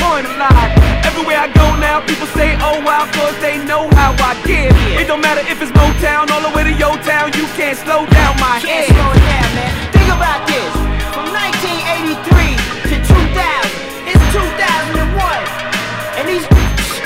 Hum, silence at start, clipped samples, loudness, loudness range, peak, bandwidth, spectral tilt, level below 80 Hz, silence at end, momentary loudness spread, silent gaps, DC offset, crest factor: none; 0 s; 1%; -12 LUFS; 2 LU; 0 dBFS; 16.5 kHz; -5 dB/octave; -16 dBFS; 0 s; 7 LU; none; under 0.1%; 12 dB